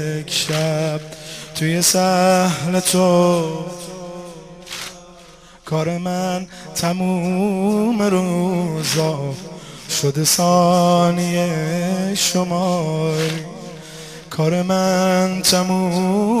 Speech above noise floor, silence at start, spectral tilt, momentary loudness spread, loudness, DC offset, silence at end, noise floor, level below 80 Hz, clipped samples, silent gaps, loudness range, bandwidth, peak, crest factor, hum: 26 dB; 0 s; -4.5 dB/octave; 17 LU; -18 LUFS; under 0.1%; 0 s; -44 dBFS; -52 dBFS; under 0.1%; none; 6 LU; 15 kHz; 0 dBFS; 18 dB; none